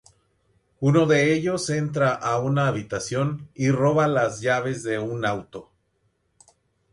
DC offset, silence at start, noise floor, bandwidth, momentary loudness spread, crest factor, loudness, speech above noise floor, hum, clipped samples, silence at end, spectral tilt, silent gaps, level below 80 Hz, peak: under 0.1%; 0.8 s; -70 dBFS; 11.5 kHz; 9 LU; 16 dB; -23 LUFS; 47 dB; none; under 0.1%; 1.3 s; -6 dB/octave; none; -58 dBFS; -8 dBFS